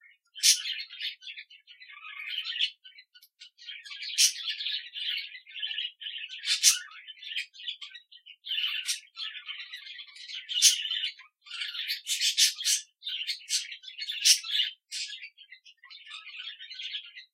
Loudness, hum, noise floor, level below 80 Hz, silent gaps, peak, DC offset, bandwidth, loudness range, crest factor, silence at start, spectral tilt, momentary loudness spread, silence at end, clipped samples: -27 LUFS; none; -57 dBFS; under -90 dBFS; none; -4 dBFS; under 0.1%; 16 kHz; 8 LU; 28 dB; 0.35 s; 13.5 dB/octave; 21 LU; 0.1 s; under 0.1%